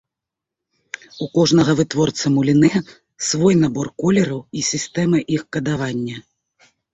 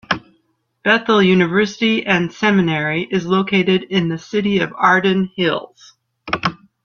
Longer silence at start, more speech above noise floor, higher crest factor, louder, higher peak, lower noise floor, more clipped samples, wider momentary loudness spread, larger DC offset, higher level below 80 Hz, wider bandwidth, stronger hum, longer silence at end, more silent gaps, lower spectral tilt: first, 1.15 s vs 0.1 s; first, 67 dB vs 48 dB; about the same, 16 dB vs 16 dB; about the same, -18 LUFS vs -17 LUFS; about the same, -2 dBFS vs 0 dBFS; first, -85 dBFS vs -64 dBFS; neither; first, 13 LU vs 8 LU; neither; about the same, -52 dBFS vs -54 dBFS; first, 8.4 kHz vs 7 kHz; neither; first, 0.75 s vs 0.3 s; neither; about the same, -5 dB/octave vs -6 dB/octave